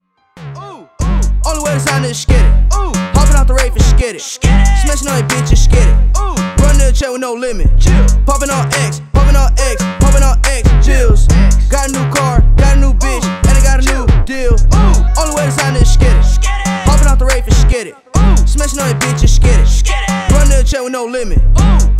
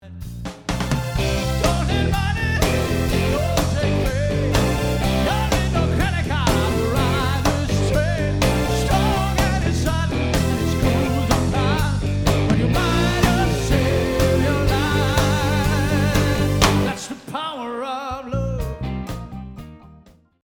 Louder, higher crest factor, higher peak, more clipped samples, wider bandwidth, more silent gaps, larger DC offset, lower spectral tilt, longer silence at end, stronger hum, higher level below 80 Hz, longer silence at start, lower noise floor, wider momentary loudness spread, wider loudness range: first, -12 LUFS vs -20 LUFS; second, 8 dB vs 20 dB; about the same, 0 dBFS vs 0 dBFS; neither; second, 13.5 kHz vs over 20 kHz; neither; neither; about the same, -5 dB/octave vs -5.5 dB/octave; second, 0 s vs 0.45 s; neither; first, -10 dBFS vs -28 dBFS; first, 0.35 s vs 0.05 s; second, -32 dBFS vs -50 dBFS; second, 5 LU vs 9 LU; about the same, 1 LU vs 3 LU